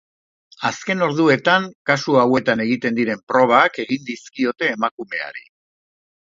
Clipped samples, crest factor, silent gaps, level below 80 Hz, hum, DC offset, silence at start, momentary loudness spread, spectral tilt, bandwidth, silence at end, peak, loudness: under 0.1%; 20 dB; 1.75-1.85 s, 3.23-3.27 s, 4.91-4.98 s; -66 dBFS; none; under 0.1%; 0.6 s; 12 LU; -5 dB/octave; 7.6 kHz; 0.9 s; 0 dBFS; -18 LUFS